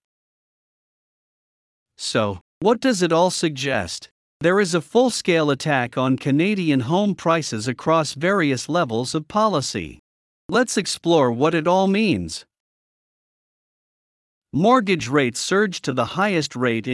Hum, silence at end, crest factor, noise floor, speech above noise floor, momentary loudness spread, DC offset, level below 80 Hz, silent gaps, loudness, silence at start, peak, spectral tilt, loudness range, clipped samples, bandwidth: none; 0 s; 18 dB; under -90 dBFS; over 70 dB; 7 LU; under 0.1%; -60 dBFS; 2.41-2.61 s, 4.11-4.40 s, 9.99-10.49 s, 12.60-14.42 s; -20 LUFS; 2 s; -4 dBFS; -5 dB/octave; 4 LU; under 0.1%; 12 kHz